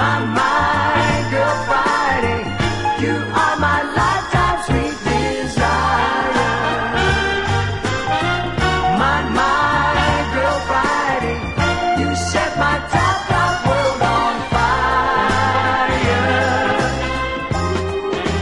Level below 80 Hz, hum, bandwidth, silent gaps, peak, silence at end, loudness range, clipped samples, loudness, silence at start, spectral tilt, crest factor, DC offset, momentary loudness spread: -32 dBFS; none; 11.5 kHz; none; -4 dBFS; 0 s; 1 LU; under 0.1%; -17 LUFS; 0 s; -5 dB/octave; 14 dB; under 0.1%; 4 LU